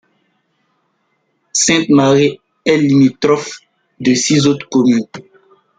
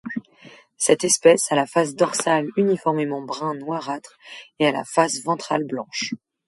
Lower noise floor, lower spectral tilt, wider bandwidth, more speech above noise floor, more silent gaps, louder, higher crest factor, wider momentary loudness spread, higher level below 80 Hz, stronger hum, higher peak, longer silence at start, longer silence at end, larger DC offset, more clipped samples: first, -64 dBFS vs -49 dBFS; about the same, -4.5 dB/octave vs -3.5 dB/octave; second, 9.6 kHz vs 12 kHz; first, 52 dB vs 27 dB; neither; first, -13 LUFS vs -21 LUFS; second, 14 dB vs 20 dB; second, 9 LU vs 16 LU; first, -56 dBFS vs -70 dBFS; neither; about the same, 0 dBFS vs -2 dBFS; first, 1.55 s vs 0.05 s; first, 0.6 s vs 0.3 s; neither; neither